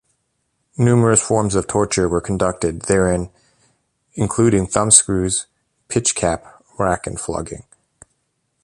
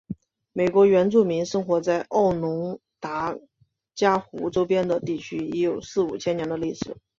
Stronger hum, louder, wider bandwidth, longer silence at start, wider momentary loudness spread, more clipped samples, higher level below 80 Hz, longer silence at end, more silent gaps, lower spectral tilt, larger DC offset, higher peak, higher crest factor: neither; first, -17 LUFS vs -24 LUFS; first, 12.5 kHz vs 7.6 kHz; first, 0.8 s vs 0.1 s; about the same, 15 LU vs 15 LU; neither; first, -40 dBFS vs -58 dBFS; first, 1.05 s vs 0.25 s; neither; second, -4.5 dB/octave vs -6.5 dB/octave; neither; first, 0 dBFS vs -6 dBFS; about the same, 20 dB vs 18 dB